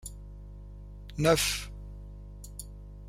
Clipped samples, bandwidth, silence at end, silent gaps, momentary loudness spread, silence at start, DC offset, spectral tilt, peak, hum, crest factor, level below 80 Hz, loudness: under 0.1%; 16 kHz; 0 s; none; 23 LU; 0 s; under 0.1%; -3.5 dB/octave; -10 dBFS; 50 Hz at -40 dBFS; 24 dB; -44 dBFS; -27 LUFS